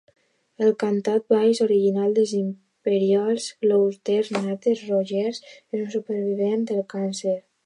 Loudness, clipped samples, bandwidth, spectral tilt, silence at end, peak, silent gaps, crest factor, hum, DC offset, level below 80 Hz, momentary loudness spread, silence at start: -23 LUFS; under 0.1%; 11 kHz; -6 dB/octave; 0.25 s; -8 dBFS; none; 16 dB; none; under 0.1%; -78 dBFS; 8 LU; 0.6 s